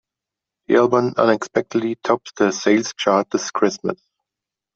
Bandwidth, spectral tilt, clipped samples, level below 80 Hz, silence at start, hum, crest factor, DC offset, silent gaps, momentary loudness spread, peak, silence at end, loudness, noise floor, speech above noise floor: 7.8 kHz; -4.5 dB/octave; under 0.1%; -62 dBFS; 0.7 s; none; 18 dB; under 0.1%; none; 7 LU; -2 dBFS; 0.8 s; -19 LUFS; -86 dBFS; 68 dB